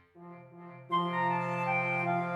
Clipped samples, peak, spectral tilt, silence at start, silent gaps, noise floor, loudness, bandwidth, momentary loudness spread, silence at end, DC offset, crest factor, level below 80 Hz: under 0.1%; -18 dBFS; -7 dB/octave; 0.15 s; none; -51 dBFS; -31 LUFS; 11 kHz; 21 LU; 0 s; under 0.1%; 14 dB; -84 dBFS